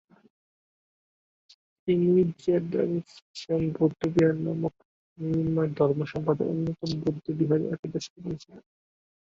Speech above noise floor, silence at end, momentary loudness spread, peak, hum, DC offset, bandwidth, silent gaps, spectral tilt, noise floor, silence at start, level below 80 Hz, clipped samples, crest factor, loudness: over 63 dB; 0.7 s; 13 LU; -10 dBFS; none; under 0.1%; 7.8 kHz; 3.22-3.34 s, 4.85-5.16 s, 7.79-7.83 s, 8.10-8.16 s; -8 dB/octave; under -90 dBFS; 1.85 s; -60 dBFS; under 0.1%; 18 dB; -27 LUFS